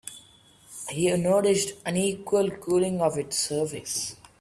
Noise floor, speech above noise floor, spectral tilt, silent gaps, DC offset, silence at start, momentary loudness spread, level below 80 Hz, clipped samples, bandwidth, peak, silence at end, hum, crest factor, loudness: -55 dBFS; 30 dB; -4 dB/octave; none; under 0.1%; 0.05 s; 12 LU; -62 dBFS; under 0.1%; 15 kHz; -10 dBFS; 0.25 s; none; 16 dB; -26 LUFS